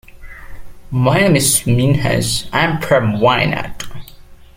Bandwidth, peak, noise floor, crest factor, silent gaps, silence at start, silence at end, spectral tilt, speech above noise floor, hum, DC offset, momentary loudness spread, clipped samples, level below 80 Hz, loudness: 16.5 kHz; 0 dBFS; -38 dBFS; 16 dB; none; 0.1 s; 0.25 s; -4.5 dB/octave; 24 dB; none; under 0.1%; 12 LU; under 0.1%; -36 dBFS; -14 LUFS